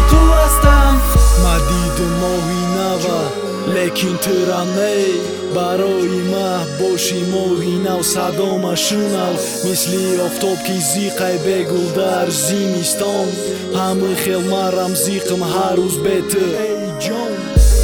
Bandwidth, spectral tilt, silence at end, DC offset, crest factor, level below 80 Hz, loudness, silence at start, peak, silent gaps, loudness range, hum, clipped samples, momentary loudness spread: 19.5 kHz; -4.5 dB/octave; 0 s; under 0.1%; 14 dB; -20 dBFS; -16 LUFS; 0 s; 0 dBFS; none; 2 LU; none; under 0.1%; 6 LU